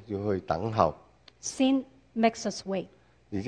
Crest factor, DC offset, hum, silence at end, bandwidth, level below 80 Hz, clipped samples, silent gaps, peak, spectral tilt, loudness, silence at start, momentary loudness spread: 24 dB; under 0.1%; none; 0 s; 10 kHz; -58 dBFS; under 0.1%; none; -6 dBFS; -5 dB/octave; -29 LUFS; 0 s; 12 LU